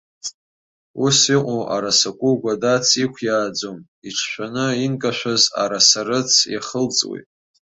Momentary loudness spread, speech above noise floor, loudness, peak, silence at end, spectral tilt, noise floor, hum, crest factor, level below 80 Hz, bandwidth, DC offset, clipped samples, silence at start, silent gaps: 14 LU; over 71 dB; -18 LUFS; 0 dBFS; 0.4 s; -2.5 dB/octave; under -90 dBFS; none; 20 dB; -62 dBFS; 8.2 kHz; under 0.1%; under 0.1%; 0.25 s; 0.34-0.94 s, 3.88-4.02 s